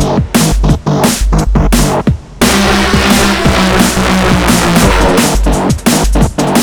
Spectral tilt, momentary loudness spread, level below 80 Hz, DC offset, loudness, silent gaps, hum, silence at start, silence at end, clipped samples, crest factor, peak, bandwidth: -4.5 dB/octave; 4 LU; -16 dBFS; under 0.1%; -10 LUFS; none; none; 0 s; 0 s; 0.7%; 8 dB; 0 dBFS; over 20 kHz